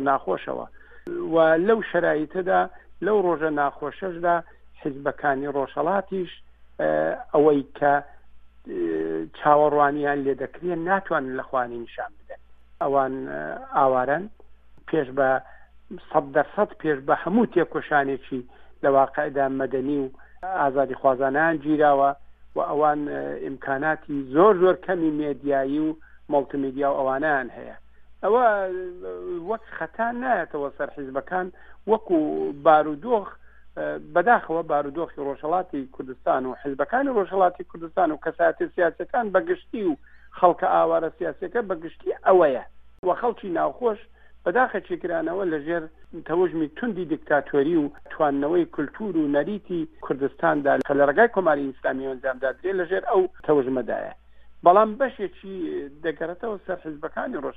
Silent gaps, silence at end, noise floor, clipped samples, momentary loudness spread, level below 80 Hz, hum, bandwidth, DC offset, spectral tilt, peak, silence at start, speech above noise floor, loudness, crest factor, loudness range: 42.99-43.03 s; 0.05 s; -46 dBFS; under 0.1%; 13 LU; -56 dBFS; none; 4.7 kHz; under 0.1%; -9 dB/octave; -2 dBFS; 0 s; 23 dB; -24 LUFS; 22 dB; 4 LU